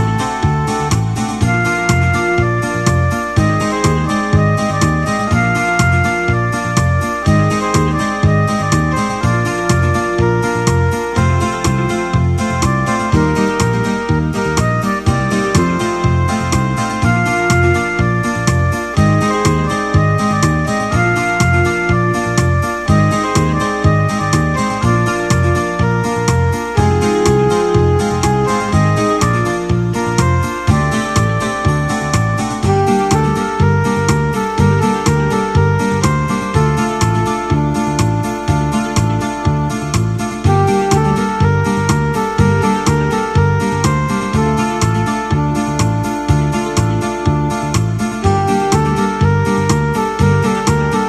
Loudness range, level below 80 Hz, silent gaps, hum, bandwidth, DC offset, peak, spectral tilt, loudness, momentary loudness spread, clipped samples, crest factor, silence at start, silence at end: 1 LU; -28 dBFS; none; none; 13.5 kHz; under 0.1%; 0 dBFS; -6 dB/octave; -14 LUFS; 3 LU; under 0.1%; 14 dB; 0 s; 0 s